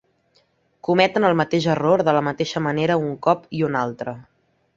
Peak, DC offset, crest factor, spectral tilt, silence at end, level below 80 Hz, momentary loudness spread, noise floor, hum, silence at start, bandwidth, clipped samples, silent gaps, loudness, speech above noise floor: -2 dBFS; under 0.1%; 18 dB; -6.5 dB/octave; 0.55 s; -60 dBFS; 12 LU; -63 dBFS; none; 0.9 s; 7.8 kHz; under 0.1%; none; -20 LUFS; 43 dB